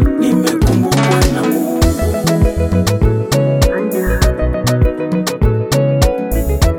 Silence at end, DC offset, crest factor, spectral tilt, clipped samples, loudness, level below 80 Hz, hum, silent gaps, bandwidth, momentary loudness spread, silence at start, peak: 0 s; under 0.1%; 12 dB; -6 dB/octave; under 0.1%; -14 LUFS; -18 dBFS; none; none; 20 kHz; 4 LU; 0 s; 0 dBFS